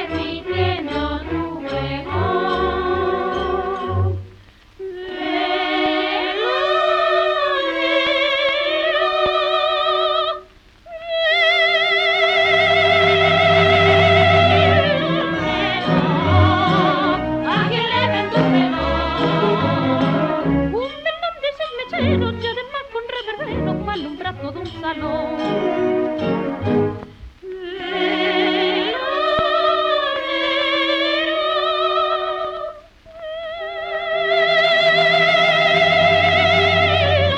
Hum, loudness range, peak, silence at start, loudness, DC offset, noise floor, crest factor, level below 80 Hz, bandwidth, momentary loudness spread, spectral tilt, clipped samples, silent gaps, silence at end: none; 9 LU; -2 dBFS; 0 s; -17 LUFS; under 0.1%; -45 dBFS; 16 dB; -42 dBFS; 9 kHz; 13 LU; -6 dB/octave; under 0.1%; none; 0 s